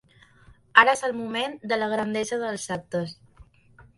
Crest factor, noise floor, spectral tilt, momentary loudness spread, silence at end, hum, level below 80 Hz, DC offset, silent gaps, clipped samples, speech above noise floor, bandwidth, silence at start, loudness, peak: 26 dB; -55 dBFS; -3.5 dB/octave; 14 LU; 0.15 s; none; -62 dBFS; under 0.1%; none; under 0.1%; 29 dB; 11.5 kHz; 0.75 s; -24 LUFS; 0 dBFS